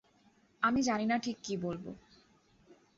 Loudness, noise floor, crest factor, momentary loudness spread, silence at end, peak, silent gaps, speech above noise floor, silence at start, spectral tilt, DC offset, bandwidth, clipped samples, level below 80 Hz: -33 LUFS; -68 dBFS; 22 dB; 16 LU; 0.25 s; -14 dBFS; none; 34 dB; 0.6 s; -4 dB/octave; under 0.1%; 7.6 kHz; under 0.1%; -66 dBFS